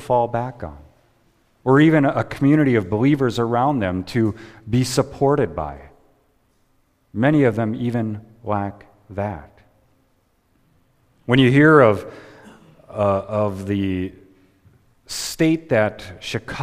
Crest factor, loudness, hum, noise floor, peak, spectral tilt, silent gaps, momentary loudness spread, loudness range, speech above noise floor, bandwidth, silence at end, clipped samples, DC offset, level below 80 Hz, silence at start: 20 dB; -19 LUFS; none; -63 dBFS; 0 dBFS; -6.5 dB/octave; none; 18 LU; 7 LU; 44 dB; 15.5 kHz; 0 s; under 0.1%; under 0.1%; -48 dBFS; 0 s